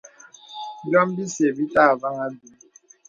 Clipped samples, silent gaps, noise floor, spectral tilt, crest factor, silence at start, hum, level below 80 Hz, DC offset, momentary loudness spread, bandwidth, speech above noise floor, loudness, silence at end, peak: under 0.1%; none; -46 dBFS; -5 dB/octave; 22 dB; 0.5 s; none; -64 dBFS; under 0.1%; 18 LU; 9.2 kHz; 25 dB; -21 LUFS; 0.7 s; -2 dBFS